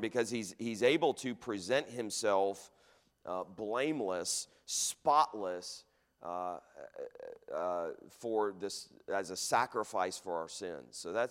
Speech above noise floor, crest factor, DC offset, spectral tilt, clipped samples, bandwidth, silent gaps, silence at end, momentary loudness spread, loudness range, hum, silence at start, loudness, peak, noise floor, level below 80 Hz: 28 dB; 20 dB; under 0.1%; -3 dB/octave; under 0.1%; 16 kHz; none; 0 s; 17 LU; 6 LU; none; 0 s; -35 LUFS; -16 dBFS; -64 dBFS; -78 dBFS